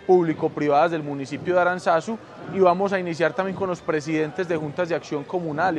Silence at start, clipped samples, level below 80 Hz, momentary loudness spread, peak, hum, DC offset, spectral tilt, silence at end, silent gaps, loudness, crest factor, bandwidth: 0 s; under 0.1%; -64 dBFS; 9 LU; -4 dBFS; none; under 0.1%; -6.5 dB/octave; 0 s; none; -23 LUFS; 18 dB; 9.6 kHz